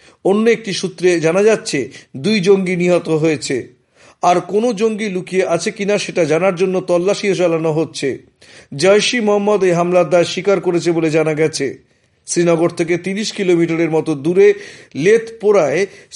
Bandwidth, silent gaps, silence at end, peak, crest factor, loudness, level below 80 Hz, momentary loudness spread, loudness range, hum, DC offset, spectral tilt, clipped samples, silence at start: 11.5 kHz; none; 0 s; 0 dBFS; 14 dB; -15 LUFS; -62 dBFS; 8 LU; 2 LU; none; under 0.1%; -5 dB/octave; under 0.1%; 0.25 s